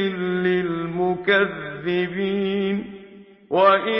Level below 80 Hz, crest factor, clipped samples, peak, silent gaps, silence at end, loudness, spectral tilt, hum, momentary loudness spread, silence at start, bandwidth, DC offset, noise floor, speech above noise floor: -58 dBFS; 16 dB; under 0.1%; -4 dBFS; none; 0 s; -22 LUFS; -10.5 dB/octave; none; 10 LU; 0 s; 5.8 kHz; under 0.1%; -45 dBFS; 25 dB